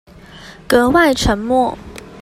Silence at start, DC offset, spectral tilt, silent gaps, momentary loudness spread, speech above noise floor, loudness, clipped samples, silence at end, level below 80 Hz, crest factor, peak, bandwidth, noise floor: 0.35 s; under 0.1%; -4.5 dB/octave; none; 16 LU; 24 dB; -14 LUFS; under 0.1%; 0 s; -32 dBFS; 16 dB; 0 dBFS; 15.5 kHz; -38 dBFS